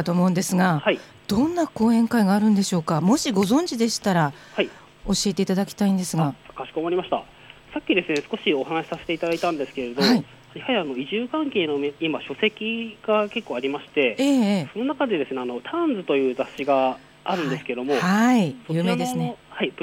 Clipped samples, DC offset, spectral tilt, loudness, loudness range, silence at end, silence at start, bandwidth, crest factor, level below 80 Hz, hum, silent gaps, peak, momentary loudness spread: under 0.1%; under 0.1%; -5 dB/octave; -23 LUFS; 4 LU; 0 s; 0 s; 16.5 kHz; 18 dB; -54 dBFS; none; none; -6 dBFS; 9 LU